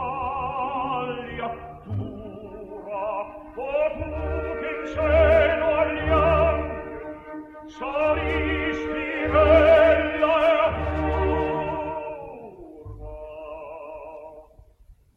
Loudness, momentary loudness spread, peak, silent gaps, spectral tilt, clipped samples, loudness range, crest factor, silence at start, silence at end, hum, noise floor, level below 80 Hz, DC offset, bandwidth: -23 LUFS; 21 LU; -6 dBFS; none; -7.5 dB/octave; under 0.1%; 11 LU; 18 dB; 0 s; 0.25 s; none; -53 dBFS; -36 dBFS; under 0.1%; 6.8 kHz